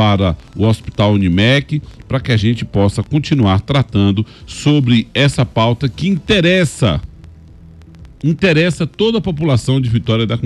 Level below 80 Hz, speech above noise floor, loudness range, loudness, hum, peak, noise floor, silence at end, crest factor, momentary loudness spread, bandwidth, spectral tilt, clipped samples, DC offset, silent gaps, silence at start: -36 dBFS; 24 dB; 2 LU; -14 LUFS; none; -2 dBFS; -38 dBFS; 0 s; 12 dB; 7 LU; 12 kHz; -6.5 dB/octave; under 0.1%; under 0.1%; none; 0 s